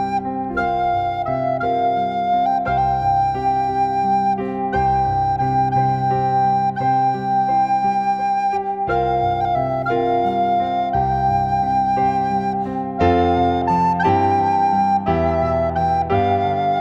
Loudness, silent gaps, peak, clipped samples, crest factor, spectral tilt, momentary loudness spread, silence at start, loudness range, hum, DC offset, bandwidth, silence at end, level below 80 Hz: -18 LUFS; none; -4 dBFS; under 0.1%; 14 dB; -8 dB/octave; 4 LU; 0 s; 2 LU; none; under 0.1%; 7.6 kHz; 0 s; -40 dBFS